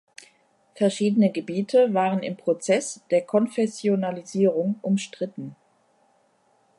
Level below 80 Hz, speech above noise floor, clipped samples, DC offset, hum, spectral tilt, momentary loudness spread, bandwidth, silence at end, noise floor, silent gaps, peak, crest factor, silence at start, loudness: -76 dBFS; 41 dB; under 0.1%; under 0.1%; none; -6 dB/octave; 8 LU; 11.5 kHz; 1.25 s; -64 dBFS; none; -8 dBFS; 18 dB; 0.75 s; -24 LUFS